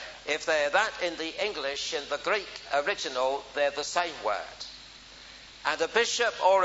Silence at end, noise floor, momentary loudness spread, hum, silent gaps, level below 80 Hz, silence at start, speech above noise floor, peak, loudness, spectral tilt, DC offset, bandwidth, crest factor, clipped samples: 0 s; -49 dBFS; 16 LU; none; none; -62 dBFS; 0 s; 20 dB; -10 dBFS; -29 LUFS; -1 dB/octave; under 0.1%; 8 kHz; 20 dB; under 0.1%